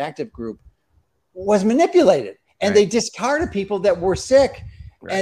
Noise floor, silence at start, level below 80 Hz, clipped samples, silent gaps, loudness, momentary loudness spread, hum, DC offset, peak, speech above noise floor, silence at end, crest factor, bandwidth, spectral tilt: -63 dBFS; 0 s; -46 dBFS; under 0.1%; none; -18 LUFS; 15 LU; none; under 0.1%; -2 dBFS; 46 dB; 0 s; 18 dB; 12 kHz; -5 dB/octave